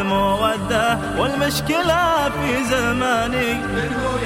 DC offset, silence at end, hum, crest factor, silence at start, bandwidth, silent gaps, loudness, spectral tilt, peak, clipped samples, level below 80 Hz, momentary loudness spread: under 0.1%; 0 s; none; 14 dB; 0 s; 16 kHz; none; -19 LUFS; -4.5 dB/octave; -6 dBFS; under 0.1%; -36 dBFS; 4 LU